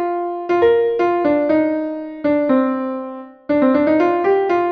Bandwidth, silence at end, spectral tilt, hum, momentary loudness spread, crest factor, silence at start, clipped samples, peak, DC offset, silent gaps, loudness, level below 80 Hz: 6.2 kHz; 0 s; -7.5 dB/octave; none; 10 LU; 14 dB; 0 s; under 0.1%; -4 dBFS; under 0.1%; none; -17 LUFS; -54 dBFS